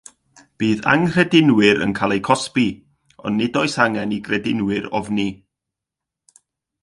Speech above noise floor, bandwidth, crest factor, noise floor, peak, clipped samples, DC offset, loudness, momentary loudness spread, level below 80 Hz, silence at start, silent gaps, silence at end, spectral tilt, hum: 67 dB; 11.5 kHz; 20 dB; -85 dBFS; 0 dBFS; under 0.1%; under 0.1%; -18 LUFS; 10 LU; -54 dBFS; 0.6 s; none; 1.5 s; -5.5 dB/octave; none